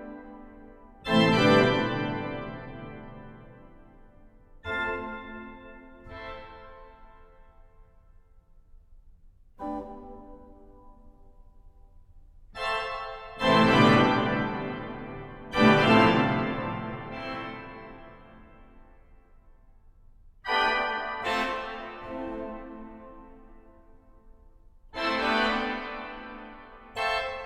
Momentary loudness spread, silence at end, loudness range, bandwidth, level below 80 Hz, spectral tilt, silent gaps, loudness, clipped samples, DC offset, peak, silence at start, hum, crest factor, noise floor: 26 LU; 0 s; 20 LU; 12.5 kHz; -50 dBFS; -6 dB/octave; none; -26 LUFS; under 0.1%; under 0.1%; -6 dBFS; 0 s; none; 24 dB; -56 dBFS